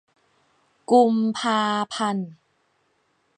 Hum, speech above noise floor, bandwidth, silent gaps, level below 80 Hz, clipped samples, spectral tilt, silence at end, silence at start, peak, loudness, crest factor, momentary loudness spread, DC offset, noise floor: none; 47 dB; 9.8 kHz; none; -76 dBFS; under 0.1%; -5 dB/octave; 1.05 s; 0.9 s; -6 dBFS; -22 LUFS; 18 dB; 15 LU; under 0.1%; -68 dBFS